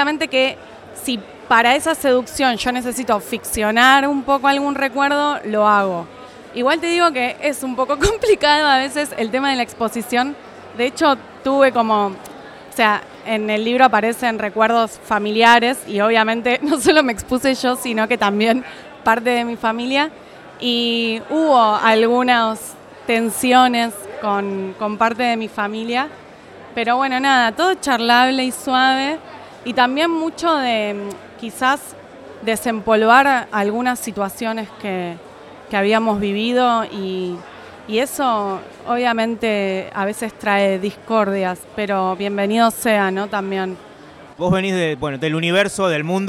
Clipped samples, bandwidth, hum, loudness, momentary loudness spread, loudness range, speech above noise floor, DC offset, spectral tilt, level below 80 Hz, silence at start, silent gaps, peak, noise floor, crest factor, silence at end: under 0.1%; 16.5 kHz; none; -17 LUFS; 11 LU; 4 LU; 23 dB; under 0.1%; -4 dB/octave; -48 dBFS; 0 s; none; 0 dBFS; -41 dBFS; 18 dB; 0 s